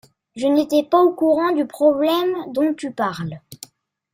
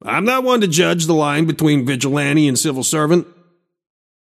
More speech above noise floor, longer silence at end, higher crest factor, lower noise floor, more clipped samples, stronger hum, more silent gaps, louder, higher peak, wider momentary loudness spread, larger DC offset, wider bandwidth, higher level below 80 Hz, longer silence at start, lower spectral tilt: second, 30 dB vs 41 dB; second, 0.6 s vs 1 s; about the same, 16 dB vs 16 dB; second, -48 dBFS vs -56 dBFS; neither; neither; neither; second, -19 LUFS vs -16 LUFS; second, -4 dBFS vs 0 dBFS; first, 15 LU vs 3 LU; neither; about the same, 16 kHz vs 15.5 kHz; about the same, -64 dBFS vs -62 dBFS; first, 0.35 s vs 0.05 s; first, -6 dB/octave vs -4.5 dB/octave